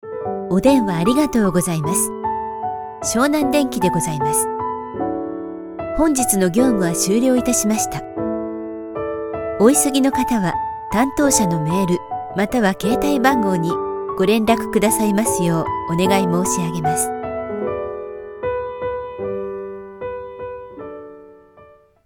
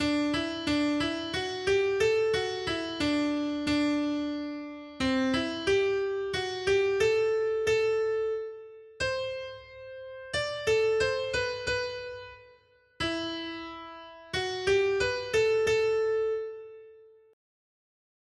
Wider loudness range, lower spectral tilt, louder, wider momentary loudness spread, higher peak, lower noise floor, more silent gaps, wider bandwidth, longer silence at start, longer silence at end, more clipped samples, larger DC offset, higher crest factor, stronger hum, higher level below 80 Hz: first, 9 LU vs 4 LU; about the same, -4.5 dB/octave vs -4 dB/octave; first, -19 LUFS vs -29 LUFS; second, 13 LU vs 16 LU; first, 0 dBFS vs -14 dBFS; second, -48 dBFS vs -61 dBFS; neither; first, 19 kHz vs 12 kHz; about the same, 0.05 s vs 0 s; second, 0.45 s vs 1.3 s; neither; neither; about the same, 18 dB vs 16 dB; neither; first, -44 dBFS vs -56 dBFS